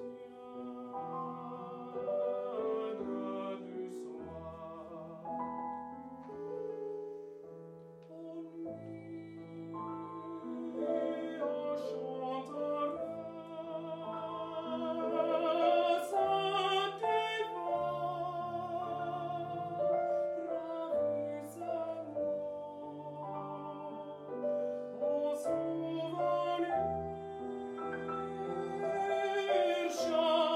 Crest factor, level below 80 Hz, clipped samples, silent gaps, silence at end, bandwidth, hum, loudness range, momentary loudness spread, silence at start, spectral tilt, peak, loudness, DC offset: 18 dB; -72 dBFS; under 0.1%; none; 0 s; 14.5 kHz; none; 11 LU; 14 LU; 0 s; -5.5 dB/octave; -18 dBFS; -37 LUFS; under 0.1%